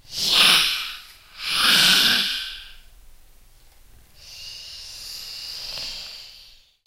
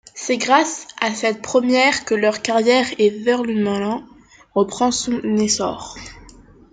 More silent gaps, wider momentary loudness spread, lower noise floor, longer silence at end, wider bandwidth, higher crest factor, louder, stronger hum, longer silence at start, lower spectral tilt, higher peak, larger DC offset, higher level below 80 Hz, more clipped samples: neither; first, 23 LU vs 10 LU; first, -50 dBFS vs -45 dBFS; about the same, 0.45 s vs 0.45 s; first, 16 kHz vs 9.6 kHz; about the same, 22 dB vs 18 dB; about the same, -17 LUFS vs -18 LUFS; neither; about the same, 0.1 s vs 0.15 s; second, 0.5 dB/octave vs -3.5 dB/octave; about the same, -2 dBFS vs -2 dBFS; neither; about the same, -50 dBFS vs -54 dBFS; neither